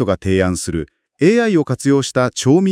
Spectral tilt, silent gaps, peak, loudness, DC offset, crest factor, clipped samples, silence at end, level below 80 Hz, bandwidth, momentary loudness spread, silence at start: -5.5 dB/octave; none; 0 dBFS; -16 LUFS; under 0.1%; 14 dB; under 0.1%; 0 s; -46 dBFS; 15.5 kHz; 9 LU; 0 s